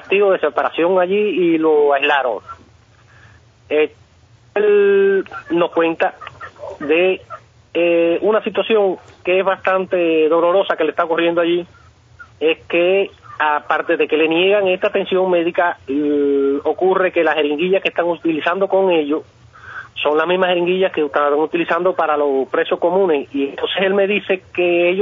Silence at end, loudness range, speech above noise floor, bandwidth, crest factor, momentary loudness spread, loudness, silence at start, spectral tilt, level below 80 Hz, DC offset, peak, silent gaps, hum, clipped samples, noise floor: 0 s; 2 LU; 34 dB; 6.2 kHz; 16 dB; 8 LU; -16 LUFS; 0 s; -7 dB/octave; -62 dBFS; under 0.1%; -2 dBFS; none; none; under 0.1%; -49 dBFS